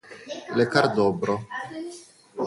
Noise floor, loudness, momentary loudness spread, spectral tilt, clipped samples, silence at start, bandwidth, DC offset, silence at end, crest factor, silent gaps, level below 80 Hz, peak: -45 dBFS; -24 LUFS; 18 LU; -5.5 dB/octave; under 0.1%; 0.05 s; 11.5 kHz; under 0.1%; 0 s; 22 dB; none; -62 dBFS; -2 dBFS